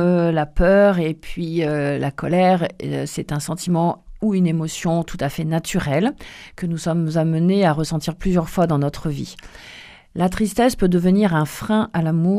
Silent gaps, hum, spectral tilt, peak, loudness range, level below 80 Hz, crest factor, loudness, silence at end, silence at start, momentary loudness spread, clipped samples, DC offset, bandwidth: none; none; -6.5 dB/octave; -4 dBFS; 2 LU; -36 dBFS; 16 dB; -20 LUFS; 0 s; 0 s; 11 LU; under 0.1%; under 0.1%; 15.5 kHz